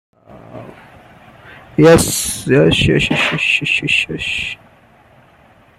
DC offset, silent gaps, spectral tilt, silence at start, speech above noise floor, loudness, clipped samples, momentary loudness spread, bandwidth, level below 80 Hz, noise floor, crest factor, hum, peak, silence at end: under 0.1%; none; -4 dB/octave; 0.3 s; 34 dB; -13 LUFS; under 0.1%; 20 LU; 15.5 kHz; -38 dBFS; -48 dBFS; 16 dB; none; -2 dBFS; 1.25 s